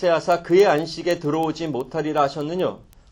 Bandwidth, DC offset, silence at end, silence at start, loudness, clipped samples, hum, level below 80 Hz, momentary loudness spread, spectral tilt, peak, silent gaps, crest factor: 17 kHz; under 0.1%; 0.35 s; 0 s; -21 LUFS; under 0.1%; none; -54 dBFS; 10 LU; -6 dB/octave; -6 dBFS; none; 16 dB